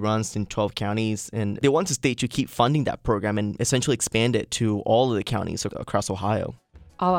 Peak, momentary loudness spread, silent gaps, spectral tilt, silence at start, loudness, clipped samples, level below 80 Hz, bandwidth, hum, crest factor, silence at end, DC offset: -4 dBFS; 6 LU; none; -5 dB/octave; 0 s; -24 LUFS; under 0.1%; -48 dBFS; 17 kHz; none; 20 dB; 0 s; under 0.1%